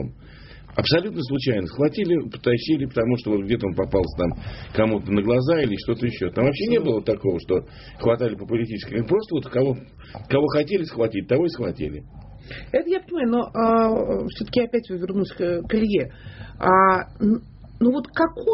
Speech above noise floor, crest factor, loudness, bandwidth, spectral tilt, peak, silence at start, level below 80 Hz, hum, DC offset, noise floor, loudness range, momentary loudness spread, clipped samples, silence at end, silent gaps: 21 dB; 18 dB; -22 LUFS; 6 kHz; -5.5 dB/octave; -4 dBFS; 0 s; -44 dBFS; none; under 0.1%; -43 dBFS; 3 LU; 8 LU; under 0.1%; 0 s; none